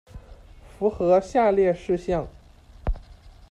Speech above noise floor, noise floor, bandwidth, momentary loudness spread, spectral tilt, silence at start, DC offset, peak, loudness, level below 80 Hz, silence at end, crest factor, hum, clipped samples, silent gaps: 26 dB; -47 dBFS; 10 kHz; 16 LU; -7.5 dB/octave; 0.15 s; under 0.1%; -8 dBFS; -23 LUFS; -38 dBFS; 0.2 s; 18 dB; none; under 0.1%; none